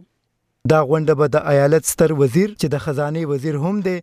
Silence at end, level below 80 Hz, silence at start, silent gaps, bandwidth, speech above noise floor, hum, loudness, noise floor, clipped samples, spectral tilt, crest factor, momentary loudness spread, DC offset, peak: 0 s; -48 dBFS; 0.65 s; none; 15.5 kHz; 54 dB; none; -18 LUFS; -71 dBFS; under 0.1%; -6 dB/octave; 16 dB; 7 LU; under 0.1%; -2 dBFS